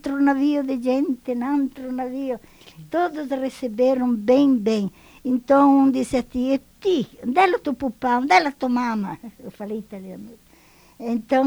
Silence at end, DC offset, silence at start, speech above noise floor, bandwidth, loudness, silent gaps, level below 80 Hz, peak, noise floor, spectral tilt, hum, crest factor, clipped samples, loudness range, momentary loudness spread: 0 s; under 0.1%; 0.05 s; 32 dB; over 20 kHz; -21 LUFS; none; -54 dBFS; -4 dBFS; -53 dBFS; -6 dB/octave; none; 18 dB; under 0.1%; 5 LU; 15 LU